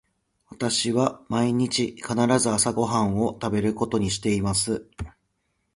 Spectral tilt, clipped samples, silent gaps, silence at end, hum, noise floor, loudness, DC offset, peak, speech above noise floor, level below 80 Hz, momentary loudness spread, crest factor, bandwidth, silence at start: -4.5 dB/octave; under 0.1%; none; 0.65 s; none; -74 dBFS; -24 LUFS; under 0.1%; -6 dBFS; 50 dB; -48 dBFS; 8 LU; 20 dB; 11.5 kHz; 0.5 s